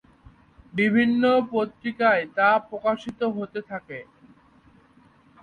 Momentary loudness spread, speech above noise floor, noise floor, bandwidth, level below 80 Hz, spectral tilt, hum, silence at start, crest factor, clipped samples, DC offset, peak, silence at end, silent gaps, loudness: 15 LU; 33 dB; -56 dBFS; 6.2 kHz; -62 dBFS; -7 dB/octave; none; 0.75 s; 18 dB; under 0.1%; under 0.1%; -6 dBFS; 1.4 s; none; -23 LUFS